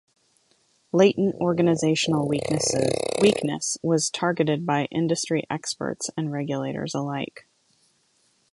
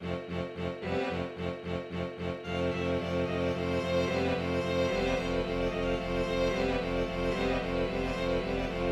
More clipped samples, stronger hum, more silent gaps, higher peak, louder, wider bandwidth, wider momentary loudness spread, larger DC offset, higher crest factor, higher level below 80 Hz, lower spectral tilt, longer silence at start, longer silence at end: neither; neither; neither; first, -6 dBFS vs -16 dBFS; first, -24 LUFS vs -32 LUFS; second, 11.5 kHz vs 13 kHz; about the same, 9 LU vs 7 LU; neither; first, 20 dB vs 14 dB; second, -62 dBFS vs -44 dBFS; second, -4.5 dB/octave vs -6 dB/octave; first, 0.95 s vs 0 s; first, 1.15 s vs 0 s